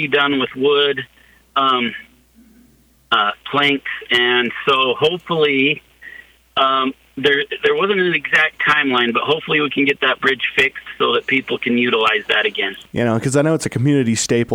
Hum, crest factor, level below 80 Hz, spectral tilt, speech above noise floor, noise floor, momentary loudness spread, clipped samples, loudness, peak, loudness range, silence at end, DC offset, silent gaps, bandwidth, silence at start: none; 16 dB; -56 dBFS; -4 dB/octave; 36 dB; -53 dBFS; 6 LU; under 0.1%; -16 LUFS; -2 dBFS; 3 LU; 0 s; under 0.1%; none; 16 kHz; 0 s